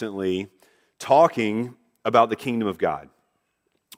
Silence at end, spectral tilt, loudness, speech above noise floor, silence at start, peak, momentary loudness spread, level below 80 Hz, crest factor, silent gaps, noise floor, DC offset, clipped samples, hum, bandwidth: 0.95 s; -6 dB/octave; -22 LUFS; 51 dB; 0 s; -4 dBFS; 17 LU; -66 dBFS; 20 dB; none; -73 dBFS; under 0.1%; under 0.1%; none; 16 kHz